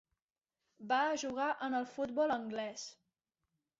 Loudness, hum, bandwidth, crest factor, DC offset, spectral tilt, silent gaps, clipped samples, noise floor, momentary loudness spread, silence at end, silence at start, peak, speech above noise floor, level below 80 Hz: -36 LUFS; none; 8 kHz; 18 dB; under 0.1%; -1.5 dB/octave; none; under 0.1%; under -90 dBFS; 13 LU; 0.85 s; 0.8 s; -22 dBFS; over 54 dB; -78 dBFS